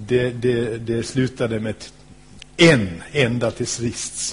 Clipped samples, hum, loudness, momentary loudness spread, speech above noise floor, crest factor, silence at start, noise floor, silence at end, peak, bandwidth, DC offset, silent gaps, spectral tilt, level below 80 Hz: under 0.1%; none; -20 LUFS; 13 LU; 24 dB; 18 dB; 0 s; -44 dBFS; 0 s; -2 dBFS; 11 kHz; 0.2%; none; -4.5 dB/octave; -46 dBFS